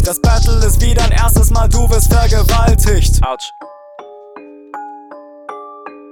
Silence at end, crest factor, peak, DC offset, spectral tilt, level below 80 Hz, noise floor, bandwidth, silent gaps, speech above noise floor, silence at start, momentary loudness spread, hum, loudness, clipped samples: 0.2 s; 12 dB; 0 dBFS; under 0.1%; -5 dB/octave; -14 dBFS; -35 dBFS; 19 kHz; none; 26 dB; 0 s; 23 LU; none; -13 LUFS; under 0.1%